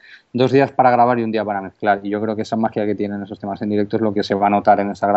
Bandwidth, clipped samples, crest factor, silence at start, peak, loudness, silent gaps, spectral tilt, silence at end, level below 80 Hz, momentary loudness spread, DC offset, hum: 8 kHz; under 0.1%; 16 dB; 0.1 s; 0 dBFS; -18 LUFS; none; -5.5 dB/octave; 0 s; -64 dBFS; 10 LU; under 0.1%; none